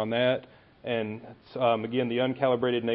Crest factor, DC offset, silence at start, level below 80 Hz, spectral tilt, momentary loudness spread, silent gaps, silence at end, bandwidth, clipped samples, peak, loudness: 18 dB; under 0.1%; 0 s; -68 dBFS; -10 dB/octave; 14 LU; none; 0 s; 5.6 kHz; under 0.1%; -10 dBFS; -28 LUFS